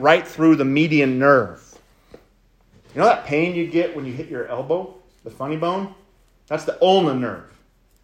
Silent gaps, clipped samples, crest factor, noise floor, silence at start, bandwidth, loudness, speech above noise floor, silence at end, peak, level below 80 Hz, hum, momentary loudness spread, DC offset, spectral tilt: none; under 0.1%; 20 dB; -57 dBFS; 0 s; 15.5 kHz; -19 LUFS; 38 dB; 0.6 s; 0 dBFS; -58 dBFS; none; 15 LU; under 0.1%; -6.5 dB/octave